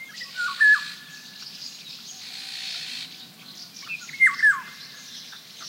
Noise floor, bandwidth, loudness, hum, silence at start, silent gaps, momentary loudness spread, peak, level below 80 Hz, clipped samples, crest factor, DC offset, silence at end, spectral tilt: -44 dBFS; 16 kHz; -21 LUFS; none; 0 s; none; 22 LU; -8 dBFS; -88 dBFS; under 0.1%; 18 dB; under 0.1%; 0 s; 1 dB/octave